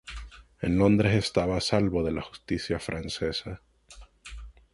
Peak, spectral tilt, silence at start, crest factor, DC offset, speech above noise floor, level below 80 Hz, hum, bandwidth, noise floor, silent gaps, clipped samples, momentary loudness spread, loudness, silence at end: -8 dBFS; -6 dB/octave; 0.05 s; 20 dB; under 0.1%; 25 dB; -44 dBFS; none; 11.5 kHz; -52 dBFS; none; under 0.1%; 23 LU; -27 LUFS; 0.2 s